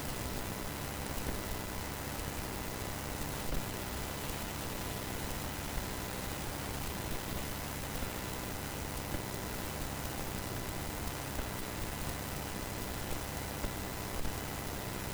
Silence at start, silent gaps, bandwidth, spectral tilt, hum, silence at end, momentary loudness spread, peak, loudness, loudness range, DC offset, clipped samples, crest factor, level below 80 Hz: 0 s; none; over 20 kHz; -4 dB/octave; none; 0 s; 1 LU; -22 dBFS; -39 LUFS; 0 LU; under 0.1%; under 0.1%; 18 dB; -46 dBFS